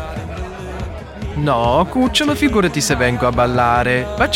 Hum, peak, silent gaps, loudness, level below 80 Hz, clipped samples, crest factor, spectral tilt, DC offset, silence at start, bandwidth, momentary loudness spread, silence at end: none; -2 dBFS; none; -16 LUFS; -30 dBFS; under 0.1%; 16 dB; -4.5 dB/octave; under 0.1%; 0 s; 16.5 kHz; 13 LU; 0 s